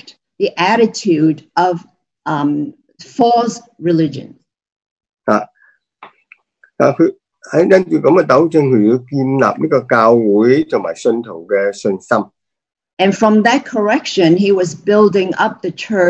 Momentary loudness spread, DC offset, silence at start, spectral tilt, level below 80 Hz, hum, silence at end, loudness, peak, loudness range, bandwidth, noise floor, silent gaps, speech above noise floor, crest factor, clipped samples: 10 LU; under 0.1%; 0.4 s; -6 dB/octave; -60 dBFS; none; 0 s; -14 LUFS; 0 dBFS; 7 LU; 8.6 kHz; -54 dBFS; 4.72-4.80 s, 4.91-4.96 s, 5.13-5.17 s, 12.93-12.97 s; 41 dB; 14 dB; under 0.1%